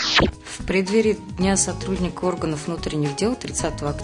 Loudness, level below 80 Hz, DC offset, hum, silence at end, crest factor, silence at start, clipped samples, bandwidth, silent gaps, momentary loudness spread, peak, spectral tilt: -22 LUFS; -38 dBFS; under 0.1%; none; 0 s; 16 dB; 0 s; under 0.1%; 11 kHz; none; 7 LU; -6 dBFS; -4 dB/octave